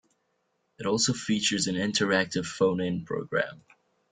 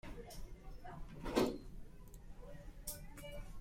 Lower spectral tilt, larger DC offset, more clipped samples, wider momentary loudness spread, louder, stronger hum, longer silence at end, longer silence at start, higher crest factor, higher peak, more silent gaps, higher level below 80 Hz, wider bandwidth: second, -3.5 dB/octave vs -5 dB/octave; neither; neither; second, 6 LU vs 21 LU; first, -27 LUFS vs -44 LUFS; neither; first, 0.55 s vs 0 s; first, 0.8 s vs 0.05 s; about the same, 20 dB vs 24 dB; first, -8 dBFS vs -20 dBFS; neither; second, -64 dBFS vs -52 dBFS; second, 9.6 kHz vs 16.5 kHz